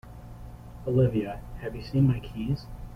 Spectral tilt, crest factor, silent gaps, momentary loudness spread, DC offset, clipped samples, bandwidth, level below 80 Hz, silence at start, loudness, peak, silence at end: -9.5 dB/octave; 18 dB; none; 21 LU; under 0.1%; under 0.1%; 6 kHz; -44 dBFS; 0.05 s; -28 LUFS; -12 dBFS; 0 s